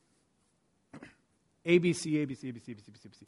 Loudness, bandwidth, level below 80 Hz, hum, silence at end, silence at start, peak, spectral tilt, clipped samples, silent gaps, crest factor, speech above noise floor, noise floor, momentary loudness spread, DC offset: -31 LUFS; 11.5 kHz; -72 dBFS; none; 0.05 s; 0.95 s; -12 dBFS; -6 dB/octave; under 0.1%; none; 22 dB; 42 dB; -74 dBFS; 26 LU; under 0.1%